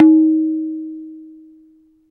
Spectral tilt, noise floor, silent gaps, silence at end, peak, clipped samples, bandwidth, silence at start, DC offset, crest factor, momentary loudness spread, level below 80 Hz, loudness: -10 dB/octave; -51 dBFS; none; 0.85 s; 0 dBFS; under 0.1%; 1.8 kHz; 0 s; under 0.1%; 16 dB; 24 LU; -74 dBFS; -16 LUFS